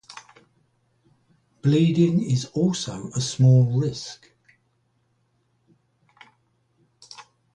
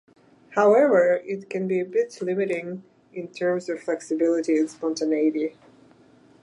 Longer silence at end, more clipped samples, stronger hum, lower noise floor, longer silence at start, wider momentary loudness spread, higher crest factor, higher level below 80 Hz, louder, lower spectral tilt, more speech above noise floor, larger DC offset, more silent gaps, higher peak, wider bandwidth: second, 0.35 s vs 0.9 s; neither; neither; first, -68 dBFS vs -55 dBFS; second, 0.1 s vs 0.5 s; first, 27 LU vs 14 LU; about the same, 18 dB vs 16 dB; first, -60 dBFS vs -78 dBFS; about the same, -22 LUFS vs -23 LUFS; about the same, -6.5 dB/octave vs -6 dB/octave; first, 48 dB vs 32 dB; neither; neither; about the same, -6 dBFS vs -8 dBFS; about the same, 10 kHz vs 11 kHz